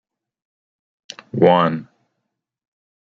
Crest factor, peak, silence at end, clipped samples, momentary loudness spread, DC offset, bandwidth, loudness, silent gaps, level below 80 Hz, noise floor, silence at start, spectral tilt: 20 dB; -2 dBFS; 1.35 s; under 0.1%; 24 LU; under 0.1%; 7.4 kHz; -16 LUFS; none; -64 dBFS; -78 dBFS; 1.35 s; -7 dB/octave